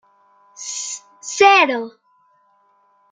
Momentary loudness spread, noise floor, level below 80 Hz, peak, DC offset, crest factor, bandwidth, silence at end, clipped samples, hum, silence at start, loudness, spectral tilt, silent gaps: 20 LU; -59 dBFS; -72 dBFS; -2 dBFS; under 0.1%; 20 dB; 9.6 kHz; 1.25 s; under 0.1%; none; 0.6 s; -16 LUFS; 0 dB/octave; none